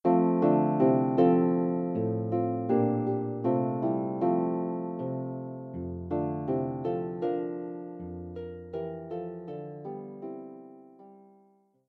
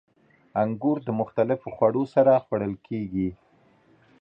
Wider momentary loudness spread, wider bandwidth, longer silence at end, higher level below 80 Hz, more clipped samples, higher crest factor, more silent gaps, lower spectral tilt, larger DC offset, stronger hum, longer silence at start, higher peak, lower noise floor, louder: first, 16 LU vs 11 LU; second, 4.3 kHz vs 5.8 kHz; second, 0.7 s vs 0.85 s; second, -64 dBFS vs -58 dBFS; neither; about the same, 18 dB vs 18 dB; neither; first, -12 dB/octave vs -10.5 dB/octave; neither; neither; second, 0.05 s vs 0.55 s; second, -12 dBFS vs -8 dBFS; first, -64 dBFS vs -60 dBFS; second, -29 LUFS vs -25 LUFS